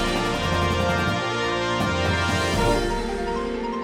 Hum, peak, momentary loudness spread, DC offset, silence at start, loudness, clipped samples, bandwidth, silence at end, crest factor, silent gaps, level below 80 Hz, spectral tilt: none; -10 dBFS; 5 LU; under 0.1%; 0 s; -23 LUFS; under 0.1%; 16.5 kHz; 0 s; 14 dB; none; -34 dBFS; -5 dB/octave